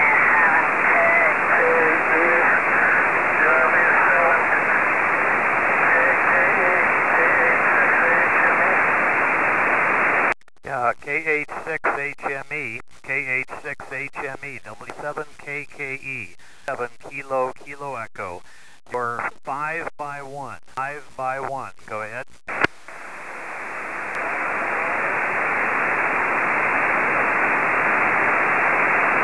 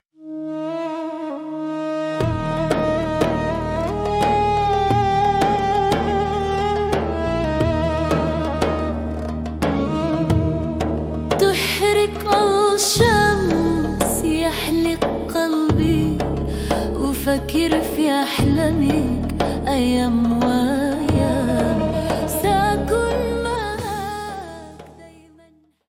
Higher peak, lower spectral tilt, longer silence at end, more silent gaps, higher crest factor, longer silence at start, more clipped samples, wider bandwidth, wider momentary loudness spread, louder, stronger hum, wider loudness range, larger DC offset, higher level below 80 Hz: second, -6 dBFS vs -2 dBFS; about the same, -5 dB/octave vs -5.5 dB/octave; second, 0 s vs 0.8 s; neither; about the same, 14 dB vs 18 dB; second, 0 s vs 0.2 s; neither; second, 11 kHz vs 17 kHz; first, 16 LU vs 9 LU; about the same, -19 LUFS vs -20 LUFS; neither; first, 13 LU vs 4 LU; first, 0.9% vs under 0.1%; second, -58 dBFS vs -34 dBFS